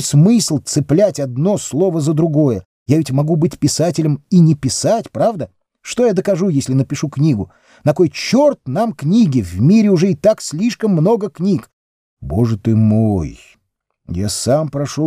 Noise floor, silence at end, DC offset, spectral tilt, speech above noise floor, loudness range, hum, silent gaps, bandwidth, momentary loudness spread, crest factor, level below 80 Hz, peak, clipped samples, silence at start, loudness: -68 dBFS; 0 s; under 0.1%; -6.5 dB/octave; 54 dB; 3 LU; none; 2.65-2.86 s, 11.73-12.17 s; 15.5 kHz; 9 LU; 14 dB; -44 dBFS; 0 dBFS; under 0.1%; 0 s; -15 LUFS